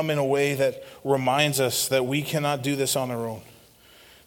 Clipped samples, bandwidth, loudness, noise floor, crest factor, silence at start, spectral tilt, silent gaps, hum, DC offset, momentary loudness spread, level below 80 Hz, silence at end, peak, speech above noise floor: under 0.1%; 19 kHz; -24 LUFS; -53 dBFS; 20 dB; 0 s; -4 dB/octave; none; none; under 0.1%; 10 LU; -64 dBFS; 0.75 s; -6 dBFS; 28 dB